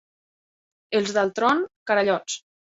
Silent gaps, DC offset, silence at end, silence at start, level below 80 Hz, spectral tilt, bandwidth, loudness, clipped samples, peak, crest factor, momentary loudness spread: 1.76-1.86 s; under 0.1%; 0.4 s; 0.9 s; -68 dBFS; -3.5 dB/octave; 8 kHz; -23 LUFS; under 0.1%; -8 dBFS; 18 dB; 7 LU